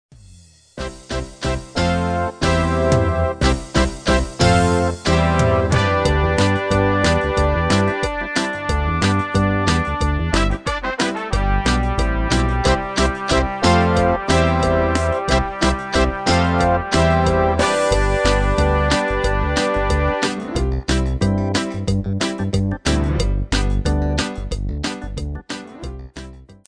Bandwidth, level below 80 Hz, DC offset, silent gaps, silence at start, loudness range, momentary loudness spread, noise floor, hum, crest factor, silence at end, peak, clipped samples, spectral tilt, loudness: 10 kHz; -24 dBFS; under 0.1%; none; 0.75 s; 4 LU; 9 LU; -46 dBFS; none; 16 dB; 0.15 s; -2 dBFS; under 0.1%; -5.5 dB/octave; -18 LUFS